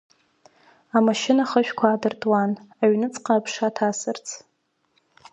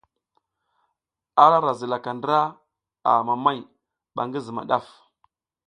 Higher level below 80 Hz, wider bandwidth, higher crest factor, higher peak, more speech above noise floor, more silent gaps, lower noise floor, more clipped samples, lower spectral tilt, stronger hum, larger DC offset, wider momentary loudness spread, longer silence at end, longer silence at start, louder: about the same, -74 dBFS vs -72 dBFS; second, 8.6 kHz vs 10 kHz; about the same, 20 dB vs 24 dB; about the same, -4 dBFS vs -2 dBFS; second, 47 dB vs 60 dB; neither; second, -69 dBFS vs -81 dBFS; neither; second, -4.5 dB/octave vs -6.5 dB/octave; neither; neither; second, 9 LU vs 14 LU; about the same, 0.95 s vs 0.85 s; second, 0.95 s vs 1.35 s; about the same, -22 LUFS vs -22 LUFS